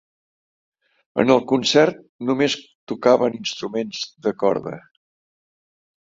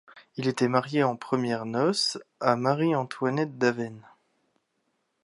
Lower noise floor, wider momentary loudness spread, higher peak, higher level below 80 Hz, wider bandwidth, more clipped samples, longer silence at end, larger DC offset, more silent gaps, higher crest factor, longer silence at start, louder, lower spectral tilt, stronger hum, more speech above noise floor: first, under -90 dBFS vs -76 dBFS; first, 12 LU vs 6 LU; first, -2 dBFS vs -6 dBFS; first, -64 dBFS vs -76 dBFS; second, 7.8 kHz vs 11.5 kHz; neither; about the same, 1.35 s vs 1.25 s; neither; first, 2.09-2.19 s, 2.75-2.87 s vs none; about the same, 20 dB vs 20 dB; first, 1.15 s vs 0.15 s; first, -20 LUFS vs -27 LUFS; about the same, -4.5 dB/octave vs -5 dB/octave; neither; first, over 70 dB vs 49 dB